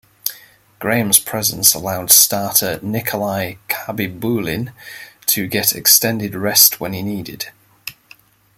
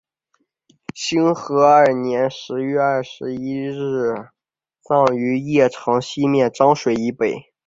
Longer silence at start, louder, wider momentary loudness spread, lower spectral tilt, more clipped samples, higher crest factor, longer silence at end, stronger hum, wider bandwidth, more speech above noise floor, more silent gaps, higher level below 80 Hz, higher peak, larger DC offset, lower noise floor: second, 0.25 s vs 0.95 s; first, -15 LUFS vs -18 LUFS; first, 19 LU vs 11 LU; second, -2 dB/octave vs -6 dB/octave; neither; about the same, 18 dB vs 18 dB; first, 0.65 s vs 0.25 s; neither; first, over 20 kHz vs 7.8 kHz; second, 31 dB vs 51 dB; neither; first, -54 dBFS vs -60 dBFS; about the same, 0 dBFS vs -2 dBFS; neither; second, -48 dBFS vs -68 dBFS